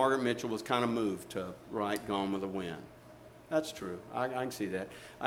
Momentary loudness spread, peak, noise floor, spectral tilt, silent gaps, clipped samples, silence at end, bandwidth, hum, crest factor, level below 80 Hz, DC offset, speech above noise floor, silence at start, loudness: 14 LU; -14 dBFS; -54 dBFS; -5 dB/octave; none; under 0.1%; 0 s; 17.5 kHz; none; 22 dB; -68 dBFS; under 0.1%; 20 dB; 0 s; -35 LUFS